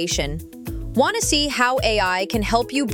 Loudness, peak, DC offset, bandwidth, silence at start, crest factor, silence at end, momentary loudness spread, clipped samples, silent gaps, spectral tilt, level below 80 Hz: -20 LUFS; -4 dBFS; under 0.1%; 17.5 kHz; 0 s; 18 dB; 0 s; 13 LU; under 0.1%; none; -3 dB/octave; -34 dBFS